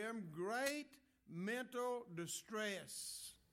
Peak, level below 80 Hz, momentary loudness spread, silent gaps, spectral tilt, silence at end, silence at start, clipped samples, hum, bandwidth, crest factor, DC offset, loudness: -22 dBFS; -84 dBFS; 8 LU; none; -3.5 dB/octave; 0.15 s; 0 s; under 0.1%; none; 16.5 kHz; 24 dB; under 0.1%; -45 LUFS